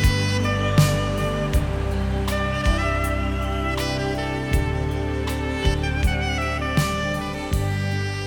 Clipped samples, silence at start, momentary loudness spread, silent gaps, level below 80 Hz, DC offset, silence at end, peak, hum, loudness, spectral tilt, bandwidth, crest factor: under 0.1%; 0 s; 5 LU; none; -28 dBFS; under 0.1%; 0 s; -4 dBFS; none; -23 LUFS; -5.5 dB/octave; 19 kHz; 18 dB